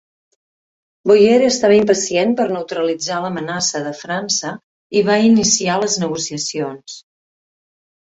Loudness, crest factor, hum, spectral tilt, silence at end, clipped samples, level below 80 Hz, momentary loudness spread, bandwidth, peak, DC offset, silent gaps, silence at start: -16 LUFS; 16 dB; none; -3.5 dB/octave; 1.1 s; under 0.1%; -58 dBFS; 13 LU; 8.2 kHz; -2 dBFS; under 0.1%; 4.63-4.90 s; 1.05 s